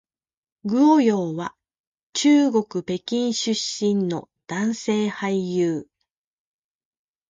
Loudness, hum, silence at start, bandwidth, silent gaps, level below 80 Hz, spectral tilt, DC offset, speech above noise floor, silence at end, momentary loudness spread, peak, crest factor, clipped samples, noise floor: -22 LUFS; none; 0.65 s; 9.4 kHz; 1.79-1.93 s, 2.03-2.13 s; -68 dBFS; -5 dB/octave; under 0.1%; 59 dB; 1.45 s; 14 LU; -8 dBFS; 16 dB; under 0.1%; -79 dBFS